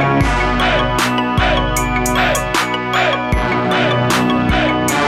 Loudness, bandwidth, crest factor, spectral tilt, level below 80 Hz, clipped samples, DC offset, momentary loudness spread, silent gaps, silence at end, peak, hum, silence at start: -15 LUFS; 16.5 kHz; 12 dB; -4.5 dB/octave; -26 dBFS; under 0.1%; 0.2%; 2 LU; none; 0 s; -4 dBFS; none; 0 s